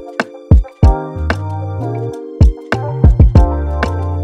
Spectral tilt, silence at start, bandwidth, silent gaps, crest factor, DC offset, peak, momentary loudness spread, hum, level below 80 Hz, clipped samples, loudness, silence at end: -8.5 dB/octave; 0 s; 8 kHz; none; 12 dB; under 0.1%; 0 dBFS; 12 LU; none; -16 dBFS; under 0.1%; -15 LUFS; 0 s